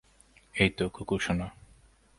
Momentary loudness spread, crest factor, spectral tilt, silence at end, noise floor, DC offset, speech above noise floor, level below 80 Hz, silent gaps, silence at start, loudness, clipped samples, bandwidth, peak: 12 LU; 26 dB; -5.5 dB/octave; 0.7 s; -61 dBFS; under 0.1%; 32 dB; -50 dBFS; none; 0.55 s; -30 LUFS; under 0.1%; 11.5 kHz; -8 dBFS